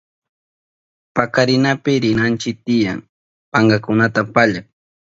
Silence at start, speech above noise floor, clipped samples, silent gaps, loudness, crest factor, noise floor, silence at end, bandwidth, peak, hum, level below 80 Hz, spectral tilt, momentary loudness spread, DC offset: 1.15 s; over 74 dB; under 0.1%; 3.09-3.52 s; -16 LUFS; 18 dB; under -90 dBFS; 0.5 s; 7.8 kHz; 0 dBFS; none; -52 dBFS; -6 dB/octave; 7 LU; under 0.1%